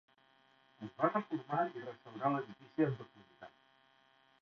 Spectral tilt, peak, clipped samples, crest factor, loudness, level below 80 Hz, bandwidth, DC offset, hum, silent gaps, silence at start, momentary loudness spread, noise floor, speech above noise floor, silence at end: -6.5 dB/octave; -16 dBFS; under 0.1%; 24 dB; -38 LUFS; -82 dBFS; 6.4 kHz; under 0.1%; none; none; 0.8 s; 22 LU; -70 dBFS; 32 dB; 0.95 s